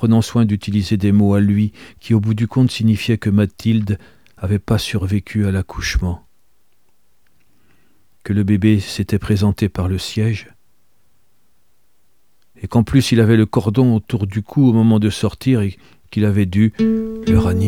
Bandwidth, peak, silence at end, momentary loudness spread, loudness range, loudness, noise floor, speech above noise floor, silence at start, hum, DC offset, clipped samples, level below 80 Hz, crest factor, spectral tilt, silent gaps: 14.5 kHz; 0 dBFS; 0 s; 8 LU; 7 LU; -17 LUFS; -65 dBFS; 49 dB; 0 s; none; 0.4%; under 0.1%; -36 dBFS; 16 dB; -7 dB/octave; none